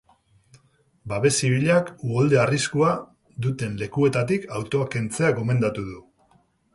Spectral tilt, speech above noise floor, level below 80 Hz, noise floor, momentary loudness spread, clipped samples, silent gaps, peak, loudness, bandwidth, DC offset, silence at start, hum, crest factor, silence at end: -5.5 dB/octave; 40 dB; -54 dBFS; -62 dBFS; 10 LU; under 0.1%; none; -6 dBFS; -23 LUFS; 11.5 kHz; under 0.1%; 1.05 s; none; 18 dB; 0.75 s